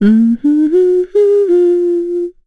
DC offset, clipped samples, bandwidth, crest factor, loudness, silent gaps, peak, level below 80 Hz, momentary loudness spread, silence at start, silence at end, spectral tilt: under 0.1%; under 0.1%; 4.6 kHz; 8 dB; -12 LUFS; none; -2 dBFS; -50 dBFS; 5 LU; 0 s; 0.15 s; -9.5 dB/octave